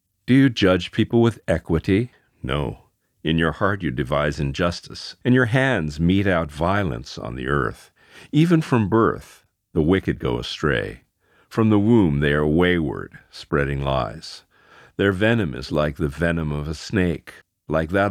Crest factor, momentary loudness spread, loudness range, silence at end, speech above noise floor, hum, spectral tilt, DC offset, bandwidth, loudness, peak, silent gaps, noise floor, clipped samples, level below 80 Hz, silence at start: 18 dB; 13 LU; 3 LU; 0 s; 31 dB; none; -7 dB/octave; under 0.1%; 14 kHz; -21 LUFS; -4 dBFS; none; -51 dBFS; under 0.1%; -40 dBFS; 0.3 s